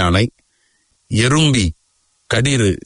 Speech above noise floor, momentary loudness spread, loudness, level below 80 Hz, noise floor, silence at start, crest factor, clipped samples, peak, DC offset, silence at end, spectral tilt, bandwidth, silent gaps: 48 dB; 9 LU; -16 LUFS; -38 dBFS; -62 dBFS; 0 s; 16 dB; under 0.1%; -2 dBFS; under 0.1%; 0.1 s; -4.5 dB/octave; 11 kHz; none